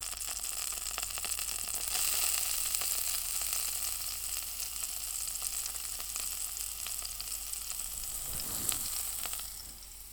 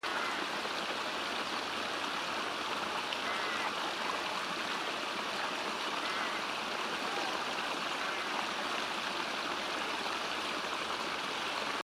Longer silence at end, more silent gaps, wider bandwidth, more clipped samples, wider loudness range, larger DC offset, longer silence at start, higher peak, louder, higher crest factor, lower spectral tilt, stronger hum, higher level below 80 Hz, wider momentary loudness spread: about the same, 0 s vs 0.05 s; neither; first, over 20 kHz vs 16 kHz; neither; first, 4 LU vs 0 LU; neither; about the same, 0 s vs 0.05 s; first, -6 dBFS vs -18 dBFS; about the same, -33 LUFS vs -35 LUFS; first, 30 dB vs 18 dB; second, 1 dB/octave vs -1.5 dB/octave; neither; first, -54 dBFS vs -72 dBFS; first, 7 LU vs 1 LU